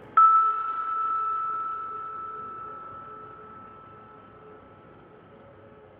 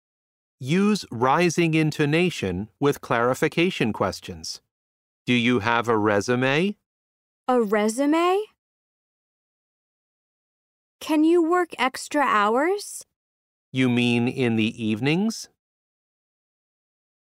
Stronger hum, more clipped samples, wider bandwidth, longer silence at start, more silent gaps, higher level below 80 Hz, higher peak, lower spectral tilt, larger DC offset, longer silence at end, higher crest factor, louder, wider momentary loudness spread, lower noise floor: neither; neither; second, 3.8 kHz vs 16 kHz; second, 0 s vs 0.6 s; second, none vs 4.71-5.25 s, 6.86-7.44 s, 8.58-10.99 s, 13.16-13.72 s; second, -68 dBFS vs -62 dBFS; second, -8 dBFS vs -4 dBFS; first, -7.5 dB/octave vs -5.5 dB/octave; neither; second, 0.25 s vs 1.75 s; about the same, 20 dB vs 20 dB; second, -25 LUFS vs -22 LUFS; first, 28 LU vs 13 LU; second, -51 dBFS vs under -90 dBFS